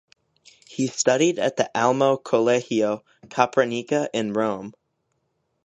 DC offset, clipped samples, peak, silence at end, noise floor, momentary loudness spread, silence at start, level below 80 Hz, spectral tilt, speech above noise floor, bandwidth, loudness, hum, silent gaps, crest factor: under 0.1%; under 0.1%; -2 dBFS; 0.95 s; -73 dBFS; 12 LU; 0.7 s; -70 dBFS; -4 dB/octave; 51 dB; 9 kHz; -22 LUFS; none; none; 22 dB